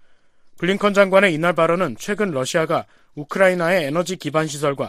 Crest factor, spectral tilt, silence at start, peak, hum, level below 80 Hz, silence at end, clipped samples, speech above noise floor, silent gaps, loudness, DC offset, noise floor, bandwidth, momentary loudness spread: 18 dB; -5 dB/octave; 0.55 s; -2 dBFS; none; -58 dBFS; 0 s; under 0.1%; 30 dB; none; -19 LUFS; under 0.1%; -49 dBFS; 15 kHz; 10 LU